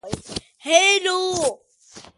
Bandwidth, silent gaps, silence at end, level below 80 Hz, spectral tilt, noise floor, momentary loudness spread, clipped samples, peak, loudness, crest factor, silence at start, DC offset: 11.5 kHz; none; 0.15 s; -52 dBFS; -1.5 dB/octave; -47 dBFS; 16 LU; under 0.1%; -2 dBFS; -18 LUFS; 20 dB; 0.05 s; under 0.1%